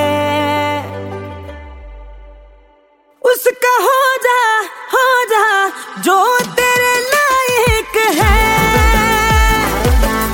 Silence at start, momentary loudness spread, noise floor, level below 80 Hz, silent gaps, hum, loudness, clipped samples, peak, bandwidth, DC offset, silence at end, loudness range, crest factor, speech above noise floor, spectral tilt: 0 s; 9 LU; -51 dBFS; -22 dBFS; none; none; -12 LUFS; under 0.1%; -2 dBFS; 17 kHz; under 0.1%; 0 s; 8 LU; 12 dB; 38 dB; -4 dB/octave